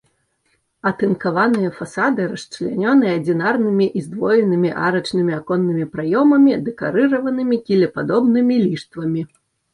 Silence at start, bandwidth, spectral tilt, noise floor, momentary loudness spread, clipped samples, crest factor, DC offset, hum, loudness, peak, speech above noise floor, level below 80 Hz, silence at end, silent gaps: 0.85 s; 11 kHz; -7.5 dB/octave; -66 dBFS; 8 LU; under 0.1%; 14 dB; under 0.1%; none; -18 LUFS; -4 dBFS; 49 dB; -60 dBFS; 0.5 s; none